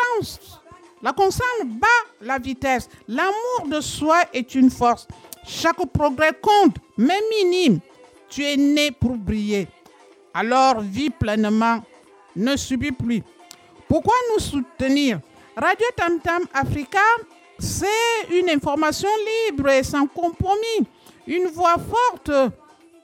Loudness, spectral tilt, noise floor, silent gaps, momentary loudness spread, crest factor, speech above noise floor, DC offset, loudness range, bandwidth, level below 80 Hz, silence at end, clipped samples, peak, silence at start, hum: -20 LUFS; -4.5 dB/octave; -50 dBFS; none; 9 LU; 16 dB; 30 dB; under 0.1%; 3 LU; 17 kHz; -44 dBFS; 0.5 s; under 0.1%; -6 dBFS; 0 s; none